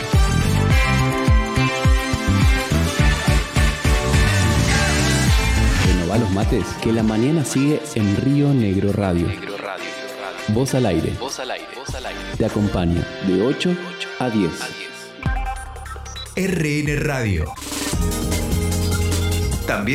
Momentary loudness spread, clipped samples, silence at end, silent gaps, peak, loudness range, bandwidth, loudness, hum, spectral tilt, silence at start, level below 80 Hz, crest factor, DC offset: 11 LU; under 0.1%; 0 s; none; -6 dBFS; 6 LU; 16 kHz; -20 LUFS; none; -5.5 dB/octave; 0 s; -26 dBFS; 12 dB; under 0.1%